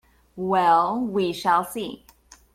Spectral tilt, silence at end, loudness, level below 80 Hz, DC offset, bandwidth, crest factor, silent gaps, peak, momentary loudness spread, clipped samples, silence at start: -5 dB/octave; 0.6 s; -22 LUFS; -60 dBFS; under 0.1%; 16 kHz; 18 dB; none; -6 dBFS; 14 LU; under 0.1%; 0.35 s